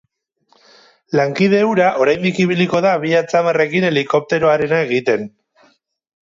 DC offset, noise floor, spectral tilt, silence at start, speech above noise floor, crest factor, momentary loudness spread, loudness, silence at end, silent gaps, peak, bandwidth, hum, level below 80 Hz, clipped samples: under 0.1%; -61 dBFS; -6 dB/octave; 1.1 s; 46 dB; 14 dB; 4 LU; -15 LUFS; 0.95 s; none; -2 dBFS; 7.6 kHz; none; -60 dBFS; under 0.1%